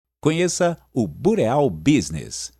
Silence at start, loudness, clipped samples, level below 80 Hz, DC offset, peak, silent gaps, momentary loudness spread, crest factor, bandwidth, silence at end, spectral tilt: 0.25 s; -21 LUFS; under 0.1%; -48 dBFS; under 0.1%; -4 dBFS; none; 7 LU; 16 dB; 13.5 kHz; 0.1 s; -5.5 dB/octave